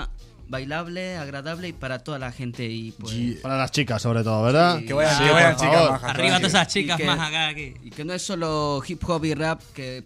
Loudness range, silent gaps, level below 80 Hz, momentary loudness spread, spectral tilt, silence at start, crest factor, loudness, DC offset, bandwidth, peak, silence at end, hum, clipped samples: 11 LU; none; -46 dBFS; 15 LU; -4.5 dB/octave; 0 s; 20 dB; -22 LUFS; under 0.1%; 15 kHz; -4 dBFS; 0 s; none; under 0.1%